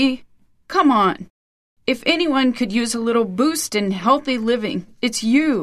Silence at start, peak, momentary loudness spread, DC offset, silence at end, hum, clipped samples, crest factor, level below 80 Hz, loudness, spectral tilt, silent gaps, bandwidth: 0 s; -4 dBFS; 7 LU; under 0.1%; 0 s; none; under 0.1%; 16 dB; -56 dBFS; -19 LUFS; -4 dB/octave; 1.30-1.77 s; 14 kHz